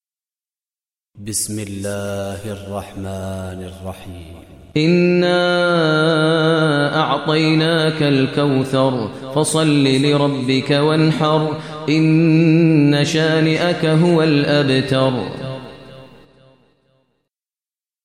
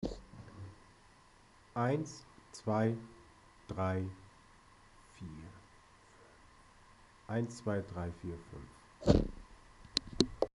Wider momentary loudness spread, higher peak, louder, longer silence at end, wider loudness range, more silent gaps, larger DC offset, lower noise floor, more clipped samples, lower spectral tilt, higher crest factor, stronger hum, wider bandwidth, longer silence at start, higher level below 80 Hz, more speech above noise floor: second, 15 LU vs 24 LU; first, -2 dBFS vs -10 dBFS; first, -16 LUFS vs -37 LUFS; first, 2 s vs 0.05 s; about the same, 11 LU vs 9 LU; neither; neither; first, under -90 dBFS vs -63 dBFS; neither; about the same, -5.5 dB/octave vs -6 dB/octave; second, 14 dB vs 30 dB; neither; first, 14 kHz vs 11.5 kHz; first, 1.15 s vs 0 s; about the same, -54 dBFS vs -50 dBFS; first, over 74 dB vs 27 dB